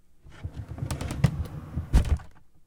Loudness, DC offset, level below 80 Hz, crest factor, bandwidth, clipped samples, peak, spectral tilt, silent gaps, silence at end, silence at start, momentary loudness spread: -30 LUFS; under 0.1%; -32 dBFS; 22 dB; 18 kHz; under 0.1%; -8 dBFS; -6.5 dB/octave; none; 0.05 s; 0.25 s; 14 LU